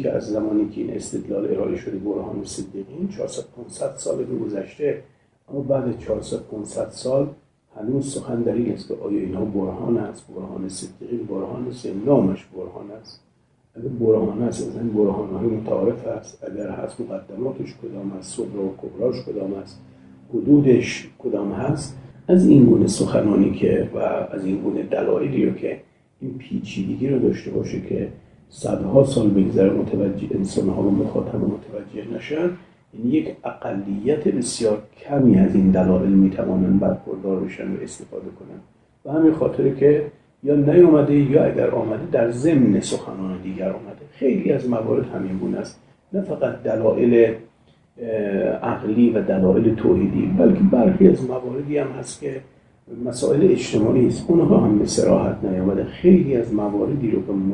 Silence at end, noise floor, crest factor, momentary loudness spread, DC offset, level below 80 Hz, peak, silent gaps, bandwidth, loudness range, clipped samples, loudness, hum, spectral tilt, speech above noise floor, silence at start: 0 s; -61 dBFS; 20 dB; 16 LU; under 0.1%; -50 dBFS; 0 dBFS; none; 10.5 kHz; 9 LU; under 0.1%; -20 LUFS; none; -7.5 dB/octave; 41 dB; 0 s